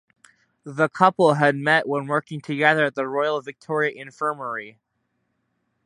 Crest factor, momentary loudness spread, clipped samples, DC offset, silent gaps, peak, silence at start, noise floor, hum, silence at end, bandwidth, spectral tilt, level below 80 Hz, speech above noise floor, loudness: 22 dB; 12 LU; under 0.1%; under 0.1%; none; -2 dBFS; 0.65 s; -74 dBFS; none; 1.15 s; 11.5 kHz; -6 dB/octave; -74 dBFS; 52 dB; -22 LUFS